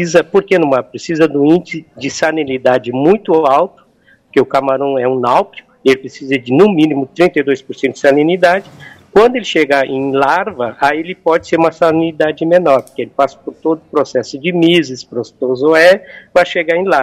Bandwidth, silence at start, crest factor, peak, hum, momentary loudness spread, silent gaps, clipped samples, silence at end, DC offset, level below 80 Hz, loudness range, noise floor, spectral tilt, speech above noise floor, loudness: 14 kHz; 0 s; 12 dB; 0 dBFS; none; 8 LU; none; under 0.1%; 0 s; under 0.1%; -52 dBFS; 2 LU; -50 dBFS; -5.5 dB/octave; 38 dB; -13 LUFS